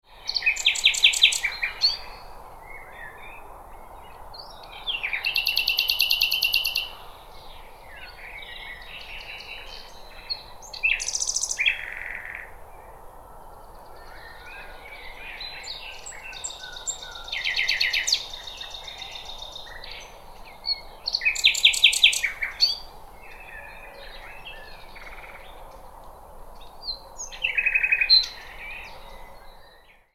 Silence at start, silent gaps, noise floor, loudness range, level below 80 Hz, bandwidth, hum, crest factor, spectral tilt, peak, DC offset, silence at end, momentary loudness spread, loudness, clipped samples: 0.1 s; none; -53 dBFS; 19 LU; -48 dBFS; 17 kHz; none; 24 dB; 2 dB/octave; -4 dBFS; under 0.1%; 0.25 s; 26 LU; -22 LUFS; under 0.1%